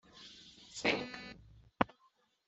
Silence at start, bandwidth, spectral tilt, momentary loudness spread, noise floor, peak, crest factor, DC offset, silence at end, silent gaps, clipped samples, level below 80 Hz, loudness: 0.15 s; 8.2 kHz; -4 dB/octave; 20 LU; -73 dBFS; -8 dBFS; 34 dB; under 0.1%; 0.6 s; none; under 0.1%; -66 dBFS; -37 LUFS